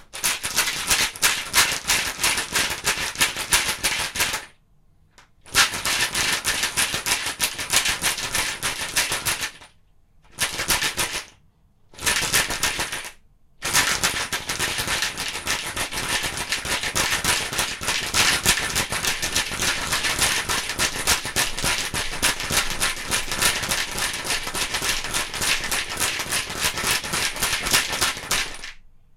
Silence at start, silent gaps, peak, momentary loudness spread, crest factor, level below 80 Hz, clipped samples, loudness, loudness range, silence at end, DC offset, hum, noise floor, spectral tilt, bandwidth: 0 s; none; -4 dBFS; 6 LU; 22 dB; -42 dBFS; under 0.1%; -22 LUFS; 3 LU; 0.2 s; under 0.1%; none; -57 dBFS; -0.5 dB/octave; 17 kHz